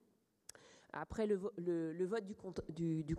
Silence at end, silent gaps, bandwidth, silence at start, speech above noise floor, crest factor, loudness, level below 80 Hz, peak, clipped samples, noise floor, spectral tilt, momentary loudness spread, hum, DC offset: 0 s; none; 12.5 kHz; 0.6 s; 23 dB; 16 dB; -42 LUFS; -66 dBFS; -26 dBFS; under 0.1%; -63 dBFS; -7.5 dB/octave; 19 LU; none; under 0.1%